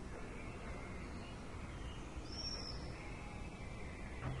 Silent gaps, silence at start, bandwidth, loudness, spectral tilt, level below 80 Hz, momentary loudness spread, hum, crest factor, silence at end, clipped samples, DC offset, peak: none; 0 s; 11.5 kHz; -48 LUFS; -5 dB/octave; -52 dBFS; 6 LU; none; 14 dB; 0 s; under 0.1%; under 0.1%; -32 dBFS